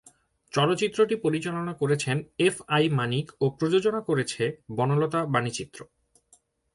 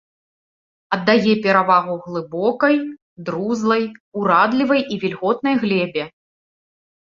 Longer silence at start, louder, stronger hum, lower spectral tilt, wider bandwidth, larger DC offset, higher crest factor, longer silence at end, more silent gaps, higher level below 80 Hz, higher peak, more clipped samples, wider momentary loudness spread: second, 0.55 s vs 0.9 s; second, -26 LUFS vs -18 LUFS; neither; about the same, -5.5 dB/octave vs -6.5 dB/octave; first, 11.5 kHz vs 7.4 kHz; neither; about the same, 18 dB vs 18 dB; second, 0.9 s vs 1.1 s; second, none vs 3.02-3.16 s, 4.00-4.12 s; about the same, -64 dBFS vs -62 dBFS; second, -8 dBFS vs -2 dBFS; neither; second, 7 LU vs 12 LU